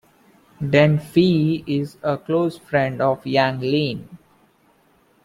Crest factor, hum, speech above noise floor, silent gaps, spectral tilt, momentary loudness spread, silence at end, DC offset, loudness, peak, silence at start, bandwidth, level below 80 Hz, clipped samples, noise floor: 18 dB; none; 39 dB; none; -7.5 dB/octave; 9 LU; 1.1 s; under 0.1%; -20 LUFS; -2 dBFS; 0.6 s; 13 kHz; -56 dBFS; under 0.1%; -58 dBFS